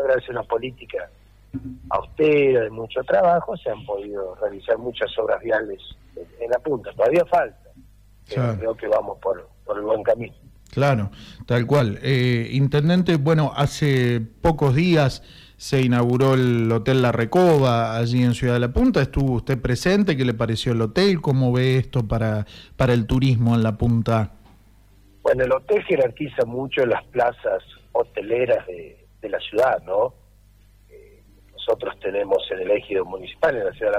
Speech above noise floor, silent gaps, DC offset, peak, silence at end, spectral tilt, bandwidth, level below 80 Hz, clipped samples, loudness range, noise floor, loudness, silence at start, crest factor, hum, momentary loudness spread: 31 dB; none; under 0.1%; -8 dBFS; 0 s; -7 dB/octave; 14.5 kHz; -42 dBFS; under 0.1%; 6 LU; -52 dBFS; -21 LUFS; 0 s; 14 dB; none; 12 LU